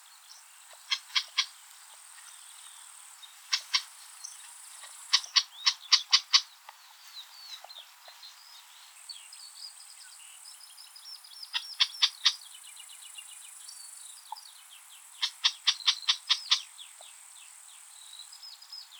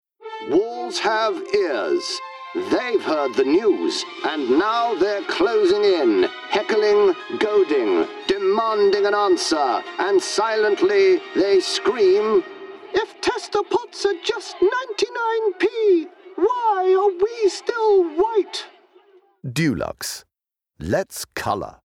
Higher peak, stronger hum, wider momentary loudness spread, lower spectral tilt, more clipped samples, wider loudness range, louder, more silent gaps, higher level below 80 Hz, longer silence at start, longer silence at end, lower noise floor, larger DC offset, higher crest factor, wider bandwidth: about the same, -6 dBFS vs -8 dBFS; neither; first, 24 LU vs 9 LU; second, 10.5 dB/octave vs -4 dB/octave; neither; first, 19 LU vs 4 LU; second, -27 LUFS vs -20 LUFS; neither; second, under -90 dBFS vs -58 dBFS; about the same, 0.3 s vs 0.2 s; second, 0 s vs 0.15 s; second, -53 dBFS vs -83 dBFS; neither; first, 28 dB vs 12 dB; first, over 20 kHz vs 15.5 kHz